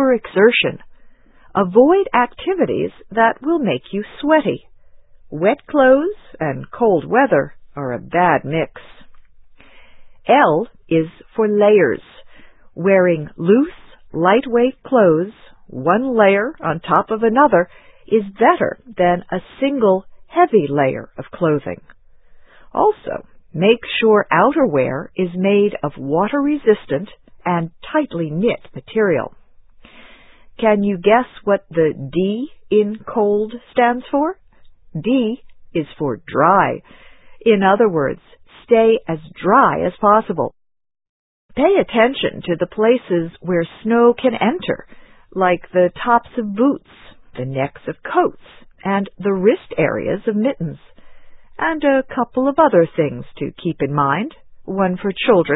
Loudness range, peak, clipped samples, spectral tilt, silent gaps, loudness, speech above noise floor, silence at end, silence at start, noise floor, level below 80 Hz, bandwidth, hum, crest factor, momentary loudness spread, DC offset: 4 LU; 0 dBFS; under 0.1%; -10.5 dB/octave; 41.09-41.49 s; -17 LUFS; 28 dB; 0 s; 0 s; -44 dBFS; -52 dBFS; 4 kHz; none; 18 dB; 13 LU; under 0.1%